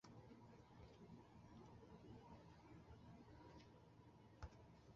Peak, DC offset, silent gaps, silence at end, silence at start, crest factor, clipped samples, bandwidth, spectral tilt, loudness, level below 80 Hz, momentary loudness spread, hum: -40 dBFS; under 0.1%; none; 0 s; 0.05 s; 24 dB; under 0.1%; 7.2 kHz; -6.5 dB/octave; -65 LUFS; -72 dBFS; 5 LU; none